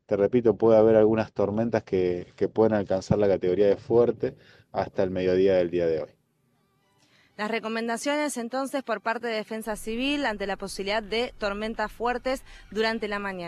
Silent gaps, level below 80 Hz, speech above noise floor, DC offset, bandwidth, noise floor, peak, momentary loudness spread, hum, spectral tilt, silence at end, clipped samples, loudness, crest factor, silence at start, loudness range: none; -52 dBFS; 44 dB; under 0.1%; 13.5 kHz; -69 dBFS; -8 dBFS; 10 LU; none; -5.5 dB/octave; 0 s; under 0.1%; -26 LUFS; 18 dB; 0.1 s; 7 LU